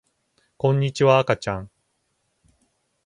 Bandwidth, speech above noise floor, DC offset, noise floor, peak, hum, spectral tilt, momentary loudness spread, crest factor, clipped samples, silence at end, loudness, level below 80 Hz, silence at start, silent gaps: 10.5 kHz; 52 dB; under 0.1%; -72 dBFS; -2 dBFS; none; -6.5 dB/octave; 11 LU; 22 dB; under 0.1%; 1.4 s; -21 LUFS; -54 dBFS; 0.65 s; none